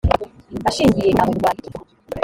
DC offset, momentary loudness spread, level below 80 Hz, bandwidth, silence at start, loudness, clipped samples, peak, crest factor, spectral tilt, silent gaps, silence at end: under 0.1%; 18 LU; -34 dBFS; 17 kHz; 0.05 s; -18 LUFS; under 0.1%; -2 dBFS; 18 dB; -6 dB/octave; none; 0 s